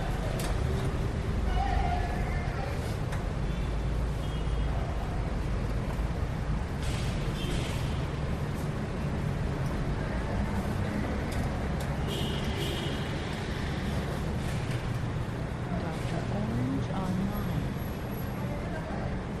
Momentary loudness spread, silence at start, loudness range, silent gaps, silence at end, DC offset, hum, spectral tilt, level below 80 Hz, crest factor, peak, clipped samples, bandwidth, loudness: 3 LU; 0 s; 1 LU; none; 0 s; under 0.1%; none; -6.5 dB/octave; -36 dBFS; 16 dB; -16 dBFS; under 0.1%; 13.5 kHz; -32 LUFS